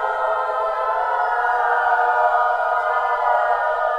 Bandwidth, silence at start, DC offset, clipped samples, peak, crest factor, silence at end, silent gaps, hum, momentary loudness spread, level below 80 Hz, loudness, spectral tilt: 9.4 kHz; 0 s; under 0.1%; under 0.1%; -6 dBFS; 14 dB; 0 s; none; none; 4 LU; -56 dBFS; -19 LUFS; -2 dB/octave